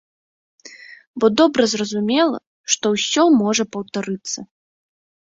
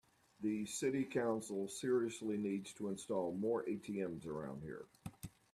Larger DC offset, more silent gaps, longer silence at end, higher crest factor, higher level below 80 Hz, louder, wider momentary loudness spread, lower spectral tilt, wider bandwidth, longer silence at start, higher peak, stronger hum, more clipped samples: neither; first, 1.07-1.14 s, 2.47-2.64 s vs none; first, 0.8 s vs 0.25 s; about the same, 18 dB vs 16 dB; first, -62 dBFS vs -74 dBFS; first, -18 LUFS vs -41 LUFS; about the same, 14 LU vs 13 LU; second, -3.5 dB/octave vs -5.5 dB/octave; second, 8 kHz vs 14 kHz; first, 0.65 s vs 0.4 s; first, -2 dBFS vs -26 dBFS; neither; neither